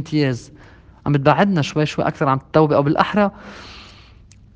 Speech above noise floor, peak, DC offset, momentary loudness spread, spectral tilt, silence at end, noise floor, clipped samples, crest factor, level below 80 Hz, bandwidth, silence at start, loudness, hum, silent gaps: 28 dB; 0 dBFS; under 0.1%; 19 LU; -7 dB/octave; 0.7 s; -46 dBFS; under 0.1%; 20 dB; -48 dBFS; 8.4 kHz; 0 s; -18 LUFS; none; none